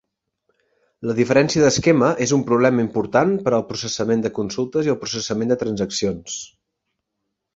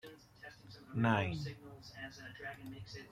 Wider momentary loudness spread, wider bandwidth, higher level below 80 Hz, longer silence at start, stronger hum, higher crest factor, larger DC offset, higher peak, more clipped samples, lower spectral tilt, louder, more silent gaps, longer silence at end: second, 9 LU vs 22 LU; second, 8 kHz vs 15.5 kHz; first, -54 dBFS vs -66 dBFS; first, 1 s vs 0.05 s; neither; about the same, 18 dB vs 22 dB; neither; first, -2 dBFS vs -18 dBFS; neither; second, -5 dB/octave vs -6.5 dB/octave; first, -19 LUFS vs -40 LUFS; neither; first, 1.1 s vs 0 s